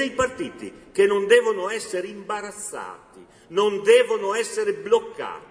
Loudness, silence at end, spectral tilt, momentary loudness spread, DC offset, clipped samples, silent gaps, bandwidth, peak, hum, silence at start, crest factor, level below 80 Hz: -22 LUFS; 0.05 s; -3 dB/octave; 16 LU; under 0.1%; under 0.1%; none; 11 kHz; -4 dBFS; none; 0 s; 18 dB; -58 dBFS